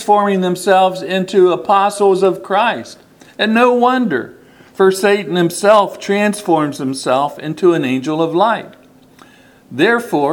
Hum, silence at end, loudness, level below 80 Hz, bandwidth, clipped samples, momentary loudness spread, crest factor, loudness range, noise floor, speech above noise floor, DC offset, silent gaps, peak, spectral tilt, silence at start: none; 0 s; -14 LUFS; -62 dBFS; 18 kHz; under 0.1%; 8 LU; 14 dB; 3 LU; -44 dBFS; 31 dB; under 0.1%; none; 0 dBFS; -5 dB/octave; 0 s